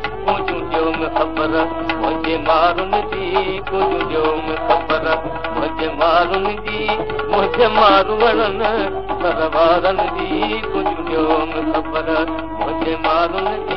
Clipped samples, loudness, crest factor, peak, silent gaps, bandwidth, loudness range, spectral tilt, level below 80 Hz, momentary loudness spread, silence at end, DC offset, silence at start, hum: under 0.1%; -18 LUFS; 18 dB; 0 dBFS; none; 6 kHz; 3 LU; -7.5 dB/octave; -36 dBFS; 7 LU; 0 s; 2%; 0 s; none